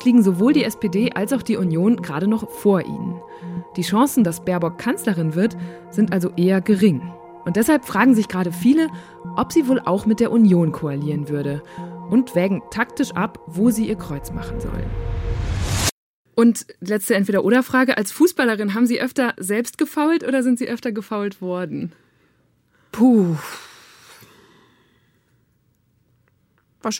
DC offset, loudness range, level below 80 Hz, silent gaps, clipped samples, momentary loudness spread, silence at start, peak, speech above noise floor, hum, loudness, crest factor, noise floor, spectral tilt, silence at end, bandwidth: under 0.1%; 5 LU; -40 dBFS; 15.92-16.25 s; under 0.1%; 12 LU; 0 s; -4 dBFS; 44 dB; none; -20 LUFS; 16 dB; -63 dBFS; -6 dB/octave; 0 s; 17 kHz